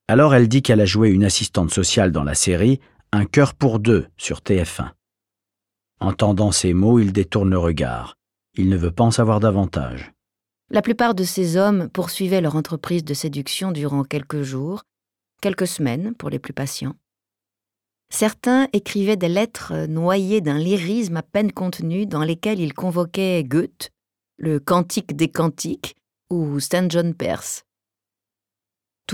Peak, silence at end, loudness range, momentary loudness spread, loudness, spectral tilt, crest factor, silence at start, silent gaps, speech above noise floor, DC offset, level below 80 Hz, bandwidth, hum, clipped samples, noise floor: -4 dBFS; 0 s; 7 LU; 12 LU; -20 LUFS; -5.5 dB/octave; 16 dB; 0.1 s; none; 69 dB; under 0.1%; -42 dBFS; 17.5 kHz; none; under 0.1%; -88 dBFS